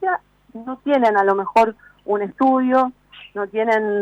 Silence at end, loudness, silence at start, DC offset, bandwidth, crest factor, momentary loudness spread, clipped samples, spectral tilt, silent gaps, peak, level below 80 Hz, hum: 0 s; -19 LUFS; 0 s; under 0.1%; 9.6 kHz; 12 dB; 15 LU; under 0.1%; -6.5 dB/octave; none; -6 dBFS; -60 dBFS; 50 Hz at -60 dBFS